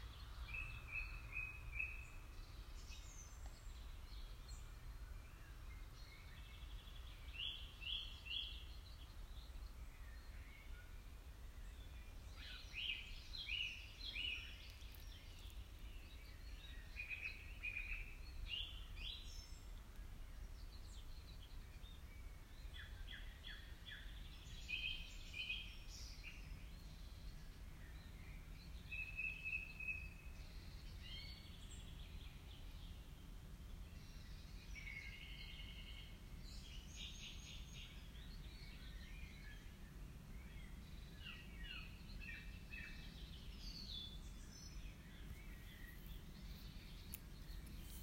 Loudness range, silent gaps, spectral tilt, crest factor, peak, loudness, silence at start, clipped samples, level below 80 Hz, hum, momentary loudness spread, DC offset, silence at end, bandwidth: 8 LU; none; -3 dB/octave; 24 dB; -28 dBFS; -53 LUFS; 0 s; under 0.1%; -56 dBFS; none; 12 LU; under 0.1%; 0 s; 16 kHz